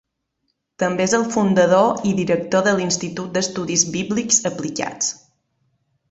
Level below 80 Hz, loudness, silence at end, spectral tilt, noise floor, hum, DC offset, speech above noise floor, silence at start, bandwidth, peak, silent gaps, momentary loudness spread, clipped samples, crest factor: -58 dBFS; -19 LUFS; 0.95 s; -3.5 dB/octave; -73 dBFS; none; under 0.1%; 54 dB; 0.8 s; 8.2 kHz; -2 dBFS; none; 9 LU; under 0.1%; 18 dB